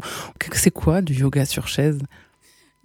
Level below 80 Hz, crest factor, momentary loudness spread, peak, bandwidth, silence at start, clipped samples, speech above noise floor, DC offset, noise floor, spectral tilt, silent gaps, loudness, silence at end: -40 dBFS; 20 dB; 11 LU; -2 dBFS; 18 kHz; 0 s; under 0.1%; 37 dB; under 0.1%; -57 dBFS; -5 dB/octave; none; -21 LUFS; 0.75 s